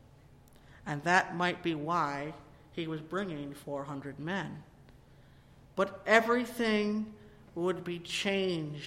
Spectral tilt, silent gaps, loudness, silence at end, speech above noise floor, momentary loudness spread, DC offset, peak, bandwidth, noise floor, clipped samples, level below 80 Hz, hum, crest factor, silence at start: -5 dB/octave; none; -32 LUFS; 0 s; 26 dB; 17 LU; under 0.1%; -10 dBFS; 16.5 kHz; -58 dBFS; under 0.1%; -64 dBFS; none; 24 dB; 0.3 s